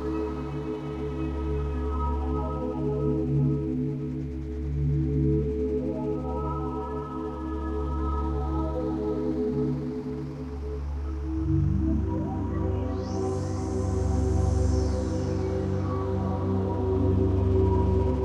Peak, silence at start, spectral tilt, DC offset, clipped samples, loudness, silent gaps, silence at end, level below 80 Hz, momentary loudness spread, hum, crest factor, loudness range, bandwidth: -12 dBFS; 0 s; -9 dB/octave; under 0.1%; under 0.1%; -28 LUFS; none; 0 s; -32 dBFS; 8 LU; none; 16 dB; 3 LU; 9 kHz